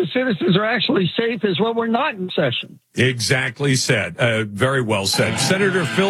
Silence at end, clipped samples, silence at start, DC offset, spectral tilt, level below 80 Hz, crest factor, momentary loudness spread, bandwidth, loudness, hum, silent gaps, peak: 0 s; under 0.1%; 0 s; under 0.1%; -4.5 dB/octave; -64 dBFS; 18 dB; 4 LU; 15.5 kHz; -19 LUFS; none; none; -2 dBFS